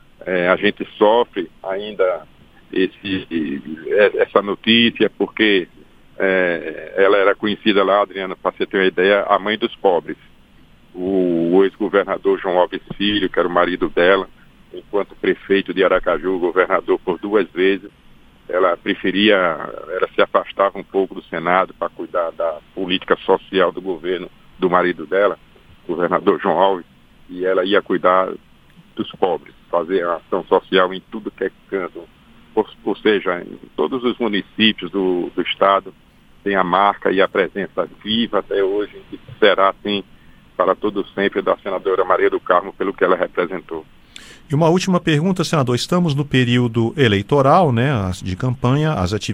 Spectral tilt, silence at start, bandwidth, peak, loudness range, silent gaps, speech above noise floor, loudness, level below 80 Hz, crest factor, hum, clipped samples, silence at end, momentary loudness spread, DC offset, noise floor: -6 dB/octave; 0.25 s; 11.5 kHz; 0 dBFS; 4 LU; none; 30 dB; -18 LUFS; -48 dBFS; 18 dB; none; under 0.1%; 0 s; 11 LU; under 0.1%; -48 dBFS